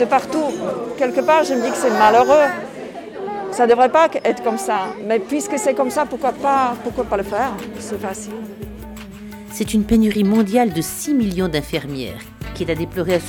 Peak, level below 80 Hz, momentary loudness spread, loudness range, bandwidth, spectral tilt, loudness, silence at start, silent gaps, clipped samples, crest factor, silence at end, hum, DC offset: -2 dBFS; -42 dBFS; 17 LU; 6 LU; 18.5 kHz; -5 dB/octave; -18 LUFS; 0 s; none; under 0.1%; 16 dB; 0 s; none; under 0.1%